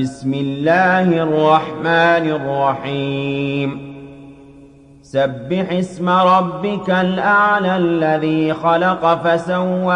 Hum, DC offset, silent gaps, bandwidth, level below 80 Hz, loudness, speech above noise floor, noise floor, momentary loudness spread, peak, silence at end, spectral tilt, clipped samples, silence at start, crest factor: none; under 0.1%; none; 9.8 kHz; -54 dBFS; -16 LUFS; 28 dB; -43 dBFS; 8 LU; -2 dBFS; 0 s; -7 dB/octave; under 0.1%; 0 s; 14 dB